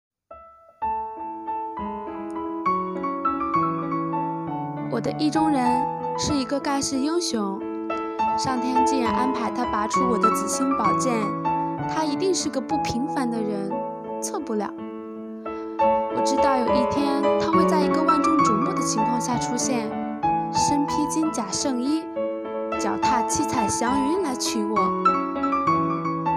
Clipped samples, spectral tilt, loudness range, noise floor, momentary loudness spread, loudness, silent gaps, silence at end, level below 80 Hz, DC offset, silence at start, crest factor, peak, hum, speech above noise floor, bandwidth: under 0.1%; -4.5 dB/octave; 6 LU; -47 dBFS; 10 LU; -23 LUFS; none; 0 s; -52 dBFS; under 0.1%; 0.3 s; 18 dB; -6 dBFS; none; 24 dB; 15.5 kHz